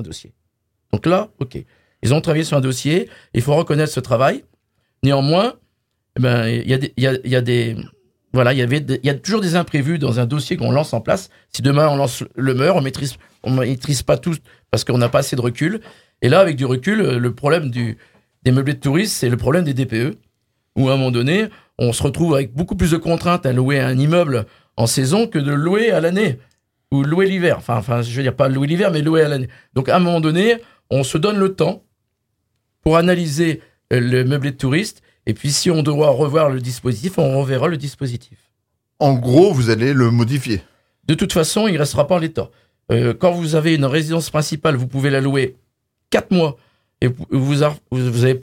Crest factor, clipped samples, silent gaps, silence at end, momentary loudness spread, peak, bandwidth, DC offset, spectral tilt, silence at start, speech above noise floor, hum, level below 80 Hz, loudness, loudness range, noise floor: 18 dB; under 0.1%; none; 0 s; 9 LU; 0 dBFS; 16.5 kHz; under 0.1%; -6 dB/octave; 0 s; 56 dB; none; -46 dBFS; -17 LUFS; 2 LU; -72 dBFS